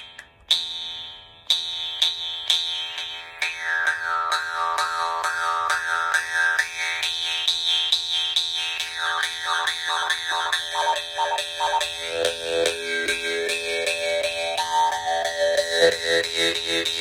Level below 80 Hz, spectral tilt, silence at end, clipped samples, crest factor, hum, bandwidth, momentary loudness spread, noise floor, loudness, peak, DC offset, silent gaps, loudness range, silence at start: -62 dBFS; 0.5 dB/octave; 0 s; under 0.1%; 22 dB; none; 17 kHz; 6 LU; -44 dBFS; -23 LUFS; -2 dBFS; under 0.1%; none; 2 LU; 0 s